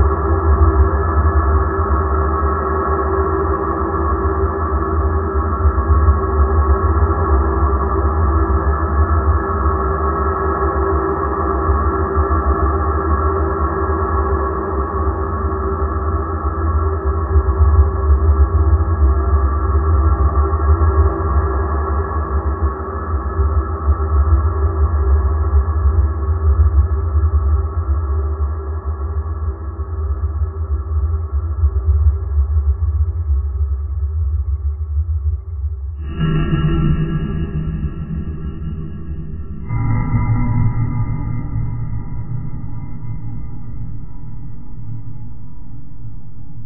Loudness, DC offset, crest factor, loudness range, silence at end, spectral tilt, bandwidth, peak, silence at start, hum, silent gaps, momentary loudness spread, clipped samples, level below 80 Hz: -18 LUFS; under 0.1%; 16 dB; 6 LU; 0 s; -13 dB/octave; 3 kHz; 0 dBFS; 0 s; none; none; 12 LU; under 0.1%; -18 dBFS